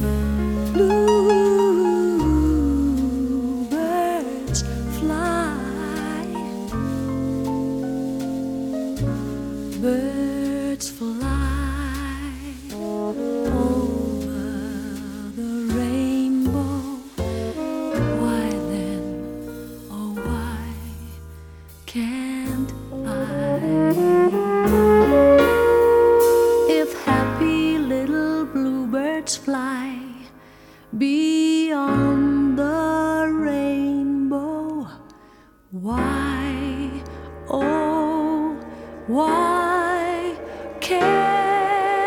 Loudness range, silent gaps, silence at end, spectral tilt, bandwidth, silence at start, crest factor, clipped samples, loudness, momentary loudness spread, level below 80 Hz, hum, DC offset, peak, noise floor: 10 LU; none; 0 s; -6 dB/octave; 19 kHz; 0 s; 18 dB; under 0.1%; -21 LUFS; 15 LU; -36 dBFS; none; under 0.1%; -4 dBFS; -50 dBFS